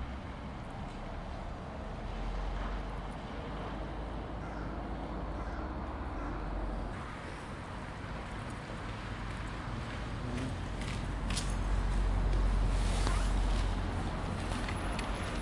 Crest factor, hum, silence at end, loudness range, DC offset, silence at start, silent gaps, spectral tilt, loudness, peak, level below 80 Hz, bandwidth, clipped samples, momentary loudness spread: 20 dB; none; 0 s; 7 LU; under 0.1%; 0 s; none; -5.5 dB/octave; -38 LUFS; -14 dBFS; -38 dBFS; 11.5 kHz; under 0.1%; 10 LU